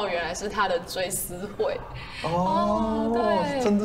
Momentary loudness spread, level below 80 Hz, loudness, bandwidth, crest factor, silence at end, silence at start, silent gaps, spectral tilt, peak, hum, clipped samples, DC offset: 8 LU; -46 dBFS; -26 LUFS; 16 kHz; 14 dB; 0 s; 0 s; none; -4.5 dB/octave; -12 dBFS; none; under 0.1%; under 0.1%